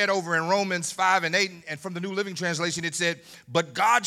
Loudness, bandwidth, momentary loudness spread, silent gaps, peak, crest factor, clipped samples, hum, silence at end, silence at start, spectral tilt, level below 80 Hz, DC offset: -25 LUFS; 16 kHz; 10 LU; none; -6 dBFS; 20 dB; under 0.1%; none; 0 s; 0 s; -3 dB/octave; -74 dBFS; under 0.1%